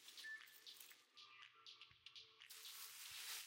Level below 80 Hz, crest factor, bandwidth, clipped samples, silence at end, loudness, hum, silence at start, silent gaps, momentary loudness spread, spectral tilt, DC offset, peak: under -90 dBFS; 20 dB; 16.5 kHz; under 0.1%; 0 s; -57 LUFS; none; 0 s; none; 9 LU; 2.5 dB/octave; under 0.1%; -38 dBFS